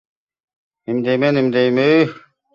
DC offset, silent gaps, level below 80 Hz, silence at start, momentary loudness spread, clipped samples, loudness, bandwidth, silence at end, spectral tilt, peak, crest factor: under 0.1%; none; -62 dBFS; 0.9 s; 9 LU; under 0.1%; -16 LUFS; 7.2 kHz; 0.35 s; -7.5 dB/octave; -2 dBFS; 16 dB